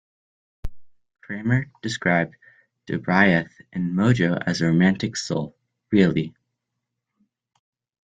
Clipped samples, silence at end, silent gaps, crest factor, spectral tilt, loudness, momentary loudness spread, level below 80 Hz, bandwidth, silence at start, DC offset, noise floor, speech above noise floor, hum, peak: under 0.1%; 1.75 s; none; 20 dB; -6 dB/octave; -22 LUFS; 17 LU; -48 dBFS; 9 kHz; 0.65 s; under 0.1%; -81 dBFS; 60 dB; none; -2 dBFS